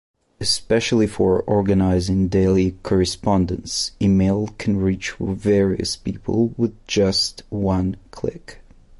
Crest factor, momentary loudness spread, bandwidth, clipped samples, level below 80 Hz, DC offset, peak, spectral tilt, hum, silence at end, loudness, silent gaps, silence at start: 14 dB; 7 LU; 11.5 kHz; under 0.1%; -36 dBFS; under 0.1%; -6 dBFS; -5.5 dB/octave; none; 0.45 s; -20 LUFS; none; 0.4 s